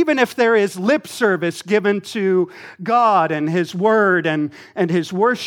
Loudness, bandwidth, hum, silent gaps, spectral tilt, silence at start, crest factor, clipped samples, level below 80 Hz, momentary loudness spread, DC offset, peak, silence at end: -18 LUFS; 18 kHz; none; none; -5.5 dB/octave; 0 s; 16 dB; under 0.1%; -72 dBFS; 7 LU; under 0.1%; -2 dBFS; 0 s